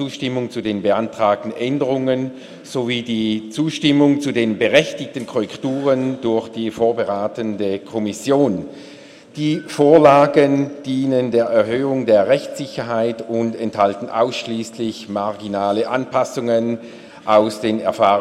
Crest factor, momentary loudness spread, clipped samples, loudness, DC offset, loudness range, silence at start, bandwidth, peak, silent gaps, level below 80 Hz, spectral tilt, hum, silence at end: 18 dB; 10 LU; under 0.1%; -18 LUFS; under 0.1%; 6 LU; 0 s; 13 kHz; 0 dBFS; none; -60 dBFS; -6 dB/octave; none; 0 s